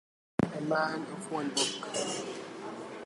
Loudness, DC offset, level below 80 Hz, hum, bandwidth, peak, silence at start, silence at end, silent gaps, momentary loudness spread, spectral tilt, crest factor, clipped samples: -34 LUFS; under 0.1%; -64 dBFS; none; 11.5 kHz; -12 dBFS; 0.4 s; 0 s; none; 11 LU; -3.5 dB/octave; 22 dB; under 0.1%